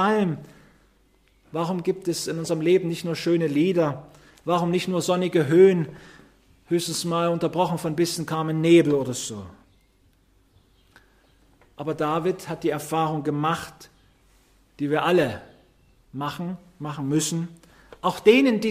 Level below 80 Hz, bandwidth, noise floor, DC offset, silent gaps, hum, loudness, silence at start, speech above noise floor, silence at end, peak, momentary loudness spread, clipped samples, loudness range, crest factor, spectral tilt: -60 dBFS; 15.5 kHz; -61 dBFS; under 0.1%; none; none; -23 LUFS; 0 s; 38 dB; 0 s; -4 dBFS; 16 LU; under 0.1%; 7 LU; 20 dB; -5.5 dB/octave